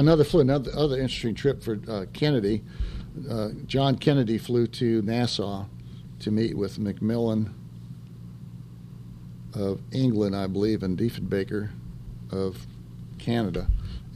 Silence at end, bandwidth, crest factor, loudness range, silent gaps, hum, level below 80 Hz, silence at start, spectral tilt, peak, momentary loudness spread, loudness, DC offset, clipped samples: 0 s; 14.5 kHz; 20 dB; 5 LU; none; none; -40 dBFS; 0 s; -7.5 dB/octave; -6 dBFS; 20 LU; -27 LUFS; under 0.1%; under 0.1%